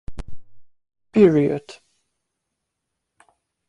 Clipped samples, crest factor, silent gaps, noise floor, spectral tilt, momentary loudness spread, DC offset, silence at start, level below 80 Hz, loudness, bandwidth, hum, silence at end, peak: under 0.1%; 22 dB; none; -79 dBFS; -8.5 dB/octave; 25 LU; under 0.1%; 0.1 s; -46 dBFS; -18 LUFS; 10 kHz; none; 1.95 s; -2 dBFS